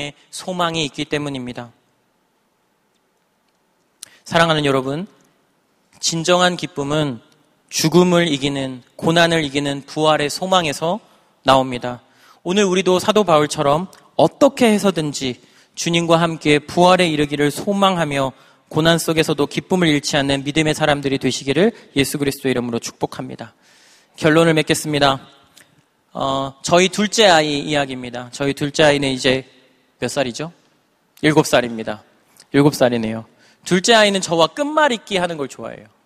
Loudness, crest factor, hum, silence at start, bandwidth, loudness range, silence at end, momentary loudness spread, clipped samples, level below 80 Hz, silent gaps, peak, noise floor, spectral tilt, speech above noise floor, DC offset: -17 LUFS; 18 dB; none; 0 s; 15.5 kHz; 5 LU; 0.2 s; 14 LU; under 0.1%; -50 dBFS; none; 0 dBFS; -64 dBFS; -4.5 dB/octave; 47 dB; under 0.1%